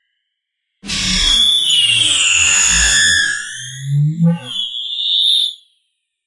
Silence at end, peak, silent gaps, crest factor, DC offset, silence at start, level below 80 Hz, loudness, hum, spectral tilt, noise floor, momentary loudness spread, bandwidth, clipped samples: 0.7 s; 0 dBFS; none; 14 dB; under 0.1%; 0.85 s; -34 dBFS; -12 LUFS; none; -1 dB/octave; -74 dBFS; 11 LU; 11.5 kHz; under 0.1%